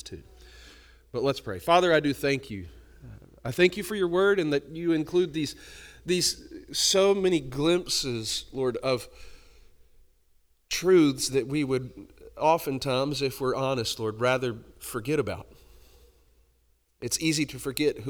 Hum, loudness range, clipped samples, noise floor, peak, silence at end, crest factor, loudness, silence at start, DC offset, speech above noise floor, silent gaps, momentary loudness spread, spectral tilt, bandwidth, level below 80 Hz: none; 5 LU; under 0.1%; -67 dBFS; -6 dBFS; 0 s; 20 dB; -26 LUFS; 0.05 s; under 0.1%; 41 dB; none; 17 LU; -4 dB/octave; over 20 kHz; -54 dBFS